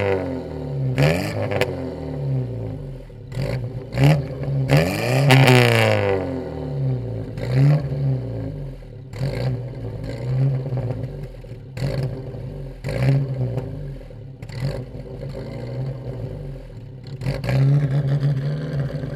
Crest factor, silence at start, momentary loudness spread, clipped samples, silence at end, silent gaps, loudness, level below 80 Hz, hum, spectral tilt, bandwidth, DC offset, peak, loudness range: 22 dB; 0 s; 17 LU; under 0.1%; 0 s; none; -22 LUFS; -40 dBFS; none; -6.5 dB/octave; 15 kHz; under 0.1%; 0 dBFS; 9 LU